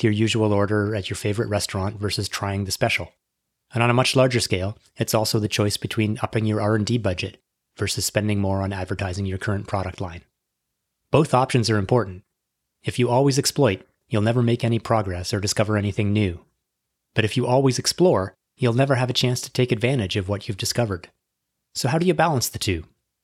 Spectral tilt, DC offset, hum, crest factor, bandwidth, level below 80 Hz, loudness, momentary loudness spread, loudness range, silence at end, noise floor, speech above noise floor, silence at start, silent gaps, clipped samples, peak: -5 dB/octave; under 0.1%; none; 20 dB; 16 kHz; -54 dBFS; -22 LUFS; 9 LU; 3 LU; 0.4 s; -79 dBFS; 58 dB; 0 s; none; under 0.1%; -2 dBFS